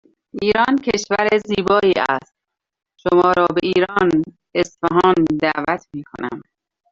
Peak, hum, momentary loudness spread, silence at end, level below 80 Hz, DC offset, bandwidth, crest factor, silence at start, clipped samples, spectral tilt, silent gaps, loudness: -2 dBFS; none; 13 LU; 0.5 s; -52 dBFS; under 0.1%; 7.6 kHz; 16 dB; 0.35 s; under 0.1%; -5.5 dB/octave; none; -17 LUFS